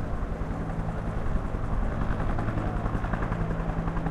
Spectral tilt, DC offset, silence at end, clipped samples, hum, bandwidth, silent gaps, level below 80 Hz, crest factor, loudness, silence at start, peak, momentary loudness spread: -8.5 dB/octave; under 0.1%; 0 s; under 0.1%; none; 9.2 kHz; none; -32 dBFS; 16 dB; -31 LUFS; 0 s; -12 dBFS; 3 LU